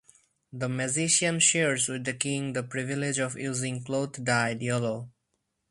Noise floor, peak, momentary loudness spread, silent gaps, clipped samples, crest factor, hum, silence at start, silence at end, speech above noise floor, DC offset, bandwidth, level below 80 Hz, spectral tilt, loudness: -79 dBFS; -8 dBFS; 11 LU; none; under 0.1%; 20 dB; none; 0.55 s; 0.6 s; 51 dB; under 0.1%; 11.5 kHz; -66 dBFS; -3 dB/octave; -27 LUFS